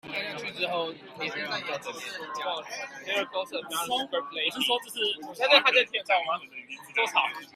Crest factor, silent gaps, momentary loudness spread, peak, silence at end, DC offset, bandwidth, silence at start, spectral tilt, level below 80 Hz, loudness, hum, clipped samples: 24 dB; none; 14 LU; -4 dBFS; 0.05 s; under 0.1%; 15.5 kHz; 0.05 s; -1.5 dB/octave; -78 dBFS; -27 LUFS; none; under 0.1%